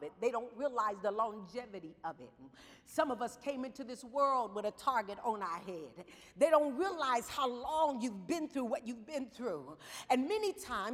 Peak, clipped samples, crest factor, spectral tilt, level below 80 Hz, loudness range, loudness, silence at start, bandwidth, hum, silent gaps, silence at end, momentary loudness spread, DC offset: -16 dBFS; under 0.1%; 22 dB; -4 dB/octave; -72 dBFS; 5 LU; -36 LUFS; 0 s; 16 kHz; none; none; 0 s; 14 LU; under 0.1%